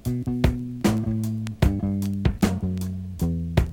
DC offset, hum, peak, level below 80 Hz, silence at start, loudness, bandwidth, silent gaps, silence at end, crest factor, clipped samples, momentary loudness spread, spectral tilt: under 0.1%; none; -6 dBFS; -32 dBFS; 0.05 s; -25 LUFS; 18 kHz; none; 0 s; 18 dB; under 0.1%; 5 LU; -7 dB/octave